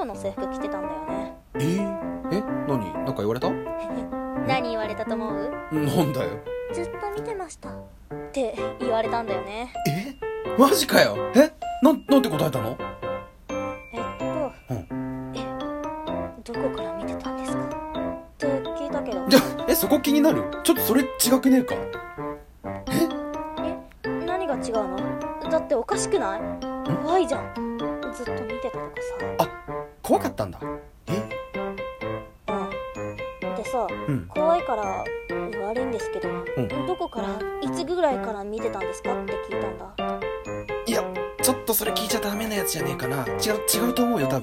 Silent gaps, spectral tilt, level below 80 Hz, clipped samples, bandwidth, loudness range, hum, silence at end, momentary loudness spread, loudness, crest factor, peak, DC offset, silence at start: none; -4.5 dB/octave; -48 dBFS; under 0.1%; 16.5 kHz; 9 LU; none; 0 s; 12 LU; -26 LUFS; 24 dB; -2 dBFS; under 0.1%; 0 s